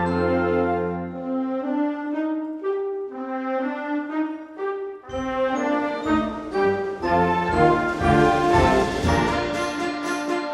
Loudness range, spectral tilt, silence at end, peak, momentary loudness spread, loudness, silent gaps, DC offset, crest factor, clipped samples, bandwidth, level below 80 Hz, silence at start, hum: 7 LU; -6 dB/octave; 0 s; -4 dBFS; 11 LU; -23 LUFS; none; under 0.1%; 18 dB; under 0.1%; 12.5 kHz; -40 dBFS; 0 s; none